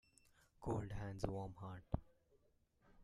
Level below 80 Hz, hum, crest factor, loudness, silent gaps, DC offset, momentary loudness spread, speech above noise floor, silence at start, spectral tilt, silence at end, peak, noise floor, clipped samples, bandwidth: -60 dBFS; none; 26 dB; -48 LUFS; none; under 0.1%; 7 LU; 32 dB; 0.6 s; -7.5 dB/octave; 0 s; -24 dBFS; -77 dBFS; under 0.1%; 12.5 kHz